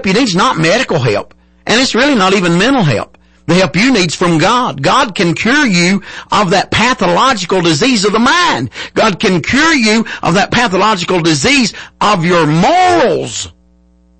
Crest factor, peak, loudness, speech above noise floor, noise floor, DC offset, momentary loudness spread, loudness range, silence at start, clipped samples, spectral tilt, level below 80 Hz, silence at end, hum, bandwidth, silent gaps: 10 dB; -2 dBFS; -10 LUFS; 37 dB; -48 dBFS; under 0.1%; 6 LU; 1 LU; 0 s; under 0.1%; -4.5 dB/octave; -40 dBFS; 0.7 s; none; 8.8 kHz; none